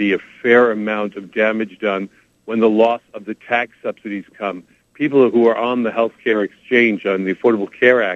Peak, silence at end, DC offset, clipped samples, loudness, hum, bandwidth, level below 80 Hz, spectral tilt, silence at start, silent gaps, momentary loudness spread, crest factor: 0 dBFS; 0 s; under 0.1%; under 0.1%; -17 LUFS; none; 7 kHz; -66 dBFS; -7 dB/octave; 0 s; none; 13 LU; 18 dB